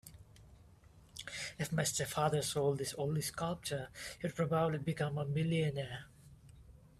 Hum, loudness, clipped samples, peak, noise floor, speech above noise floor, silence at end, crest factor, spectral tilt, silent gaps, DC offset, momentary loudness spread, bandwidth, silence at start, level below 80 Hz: none; -37 LUFS; under 0.1%; -18 dBFS; -61 dBFS; 25 dB; 0.25 s; 20 dB; -5 dB/octave; none; under 0.1%; 12 LU; 14.5 kHz; 0.05 s; -64 dBFS